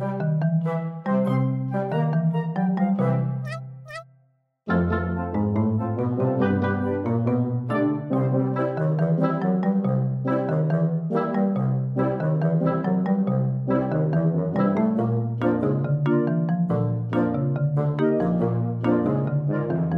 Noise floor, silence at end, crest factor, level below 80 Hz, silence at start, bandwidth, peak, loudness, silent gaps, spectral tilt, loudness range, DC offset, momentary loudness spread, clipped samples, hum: -63 dBFS; 0 s; 14 dB; -54 dBFS; 0 s; 5.4 kHz; -8 dBFS; -23 LUFS; none; -10.5 dB/octave; 3 LU; under 0.1%; 3 LU; under 0.1%; none